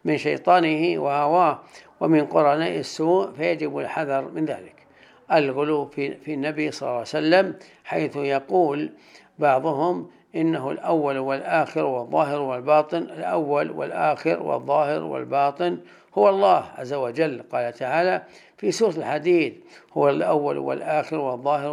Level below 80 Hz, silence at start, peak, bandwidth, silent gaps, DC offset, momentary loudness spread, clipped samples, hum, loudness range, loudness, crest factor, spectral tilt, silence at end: -76 dBFS; 0.05 s; -4 dBFS; 11.5 kHz; none; under 0.1%; 9 LU; under 0.1%; none; 3 LU; -23 LUFS; 18 dB; -6 dB/octave; 0 s